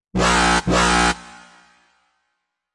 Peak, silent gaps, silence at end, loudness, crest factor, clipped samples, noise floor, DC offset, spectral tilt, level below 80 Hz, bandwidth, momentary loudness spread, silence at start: -4 dBFS; none; 1.45 s; -17 LUFS; 18 dB; under 0.1%; -75 dBFS; under 0.1%; -3.5 dB/octave; -34 dBFS; 11.5 kHz; 5 LU; 0.15 s